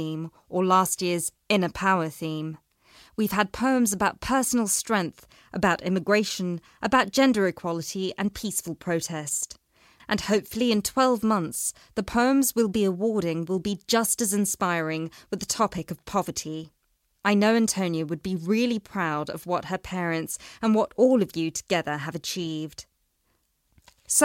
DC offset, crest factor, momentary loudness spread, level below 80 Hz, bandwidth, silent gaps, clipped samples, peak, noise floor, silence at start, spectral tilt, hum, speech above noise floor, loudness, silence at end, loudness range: under 0.1%; 20 dB; 11 LU; -56 dBFS; 16.5 kHz; none; under 0.1%; -6 dBFS; -71 dBFS; 0 s; -4 dB/octave; none; 46 dB; -25 LUFS; 0 s; 3 LU